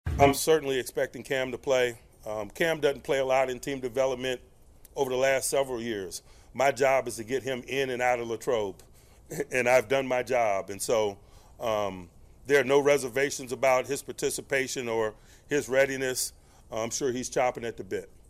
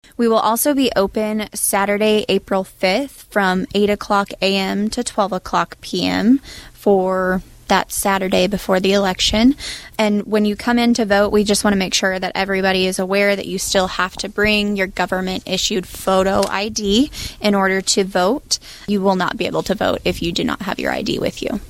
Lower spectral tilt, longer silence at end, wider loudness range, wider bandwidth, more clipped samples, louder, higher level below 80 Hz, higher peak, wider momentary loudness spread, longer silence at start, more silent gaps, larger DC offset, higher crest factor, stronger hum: about the same, -3.5 dB/octave vs -4 dB/octave; first, 0.15 s vs 0 s; about the same, 2 LU vs 2 LU; about the same, 15.5 kHz vs 16.5 kHz; neither; second, -28 LUFS vs -18 LUFS; second, -52 dBFS vs -40 dBFS; second, -6 dBFS vs 0 dBFS; first, 13 LU vs 6 LU; second, 0.05 s vs 0.2 s; neither; neither; first, 22 dB vs 16 dB; neither